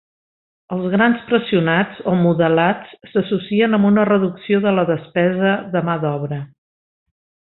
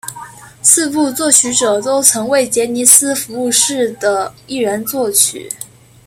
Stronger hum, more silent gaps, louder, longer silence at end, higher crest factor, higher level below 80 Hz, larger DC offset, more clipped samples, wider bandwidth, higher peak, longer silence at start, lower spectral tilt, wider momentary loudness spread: neither; neither; second, -17 LUFS vs -12 LUFS; first, 1.15 s vs 0.4 s; about the same, 16 dB vs 14 dB; about the same, -58 dBFS vs -54 dBFS; neither; second, under 0.1% vs 0.3%; second, 4.1 kHz vs over 20 kHz; about the same, -2 dBFS vs 0 dBFS; first, 0.7 s vs 0.05 s; first, -12 dB/octave vs -1.5 dB/octave; second, 10 LU vs 16 LU